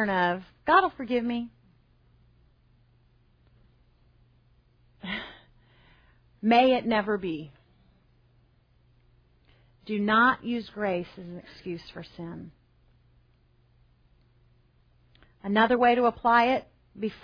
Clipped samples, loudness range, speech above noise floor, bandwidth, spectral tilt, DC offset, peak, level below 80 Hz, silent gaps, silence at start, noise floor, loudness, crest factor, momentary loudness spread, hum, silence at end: under 0.1%; 18 LU; 38 dB; 5.2 kHz; -7 dB/octave; under 0.1%; -8 dBFS; -60 dBFS; none; 0 s; -63 dBFS; -26 LUFS; 20 dB; 21 LU; none; 0.1 s